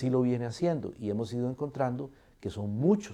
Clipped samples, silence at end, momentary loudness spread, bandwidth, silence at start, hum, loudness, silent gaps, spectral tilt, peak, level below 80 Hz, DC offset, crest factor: under 0.1%; 0 s; 12 LU; 10.5 kHz; 0 s; none; -32 LUFS; none; -8 dB/octave; -14 dBFS; -62 dBFS; under 0.1%; 16 dB